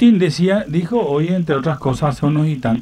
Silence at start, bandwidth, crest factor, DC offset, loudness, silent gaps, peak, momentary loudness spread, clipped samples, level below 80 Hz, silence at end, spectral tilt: 0 s; 10.5 kHz; 14 dB; under 0.1%; -17 LUFS; none; -2 dBFS; 4 LU; under 0.1%; -44 dBFS; 0 s; -7.5 dB/octave